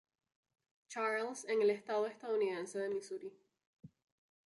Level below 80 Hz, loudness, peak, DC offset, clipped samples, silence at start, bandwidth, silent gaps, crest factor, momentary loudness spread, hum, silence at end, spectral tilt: -88 dBFS; -38 LUFS; -24 dBFS; under 0.1%; under 0.1%; 0.9 s; 11.5 kHz; 3.66-3.77 s; 16 dB; 14 LU; none; 0.6 s; -4 dB/octave